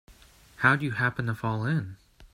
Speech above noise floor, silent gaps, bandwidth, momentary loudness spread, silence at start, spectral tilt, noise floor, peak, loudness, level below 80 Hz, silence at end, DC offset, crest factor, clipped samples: 28 dB; none; 13 kHz; 8 LU; 0.1 s; -7 dB/octave; -55 dBFS; -6 dBFS; -27 LUFS; -58 dBFS; 0.1 s; under 0.1%; 24 dB; under 0.1%